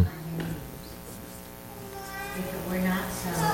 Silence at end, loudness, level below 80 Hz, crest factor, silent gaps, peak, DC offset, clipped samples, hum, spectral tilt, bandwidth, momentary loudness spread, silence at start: 0 s; -33 LUFS; -48 dBFS; 20 dB; none; -10 dBFS; under 0.1%; under 0.1%; 60 Hz at -50 dBFS; -5 dB/octave; 17 kHz; 14 LU; 0 s